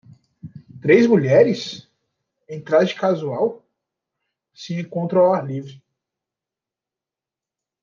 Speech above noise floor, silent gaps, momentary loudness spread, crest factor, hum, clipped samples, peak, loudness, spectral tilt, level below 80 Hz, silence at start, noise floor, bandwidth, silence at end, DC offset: 71 dB; none; 21 LU; 18 dB; none; under 0.1%; -2 dBFS; -18 LUFS; -7 dB/octave; -68 dBFS; 0.45 s; -89 dBFS; 7.2 kHz; 2.1 s; under 0.1%